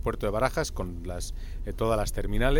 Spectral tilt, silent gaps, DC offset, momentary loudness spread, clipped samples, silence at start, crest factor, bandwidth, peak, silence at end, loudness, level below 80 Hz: -5 dB/octave; none; under 0.1%; 11 LU; under 0.1%; 0 s; 16 dB; 17.5 kHz; -10 dBFS; 0 s; -30 LUFS; -32 dBFS